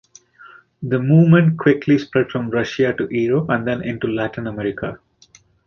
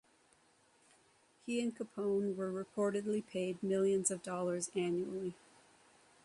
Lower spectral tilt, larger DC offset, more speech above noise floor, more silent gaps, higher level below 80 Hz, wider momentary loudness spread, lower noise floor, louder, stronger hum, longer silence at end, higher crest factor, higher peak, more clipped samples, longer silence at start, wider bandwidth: first, -8.5 dB/octave vs -5 dB/octave; neither; about the same, 35 dB vs 34 dB; neither; first, -52 dBFS vs -80 dBFS; first, 12 LU vs 8 LU; second, -52 dBFS vs -70 dBFS; first, -18 LUFS vs -37 LUFS; neither; second, 0.7 s vs 0.9 s; about the same, 16 dB vs 18 dB; first, -2 dBFS vs -20 dBFS; neither; second, 0.45 s vs 1.45 s; second, 6.8 kHz vs 11.5 kHz